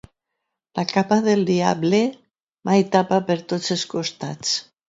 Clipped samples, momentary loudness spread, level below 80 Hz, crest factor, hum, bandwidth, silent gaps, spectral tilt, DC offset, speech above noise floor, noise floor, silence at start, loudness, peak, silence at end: under 0.1%; 9 LU; -64 dBFS; 18 dB; none; 7.8 kHz; 2.43-2.47 s; -5 dB/octave; under 0.1%; 60 dB; -80 dBFS; 0.75 s; -21 LUFS; -2 dBFS; 0.25 s